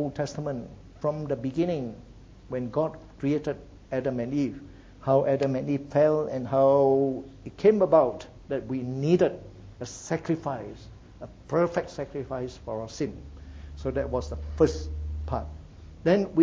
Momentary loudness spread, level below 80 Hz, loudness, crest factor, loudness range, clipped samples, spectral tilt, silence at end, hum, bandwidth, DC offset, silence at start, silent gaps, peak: 20 LU; -44 dBFS; -27 LUFS; 20 dB; 8 LU; under 0.1%; -7.5 dB/octave; 0 s; none; 7.8 kHz; under 0.1%; 0 s; none; -8 dBFS